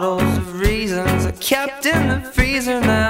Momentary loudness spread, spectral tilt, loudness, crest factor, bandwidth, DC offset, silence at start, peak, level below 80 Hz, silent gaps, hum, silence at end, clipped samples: 3 LU; -5 dB/octave; -18 LUFS; 16 dB; 16.5 kHz; under 0.1%; 0 s; -2 dBFS; -28 dBFS; none; none; 0 s; under 0.1%